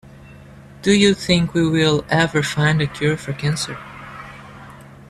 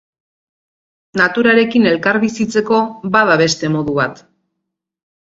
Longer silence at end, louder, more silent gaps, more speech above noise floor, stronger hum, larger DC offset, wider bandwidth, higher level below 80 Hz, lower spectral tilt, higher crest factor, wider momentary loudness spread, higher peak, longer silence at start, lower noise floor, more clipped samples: second, 0.25 s vs 1.15 s; second, -18 LUFS vs -14 LUFS; neither; second, 24 dB vs 63 dB; neither; neither; first, 13 kHz vs 7.8 kHz; first, -46 dBFS vs -54 dBFS; about the same, -5 dB/octave vs -5 dB/octave; about the same, 18 dB vs 16 dB; first, 21 LU vs 7 LU; about the same, -2 dBFS vs 0 dBFS; second, 0.05 s vs 1.15 s; second, -41 dBFS vs -77 dBFS; neither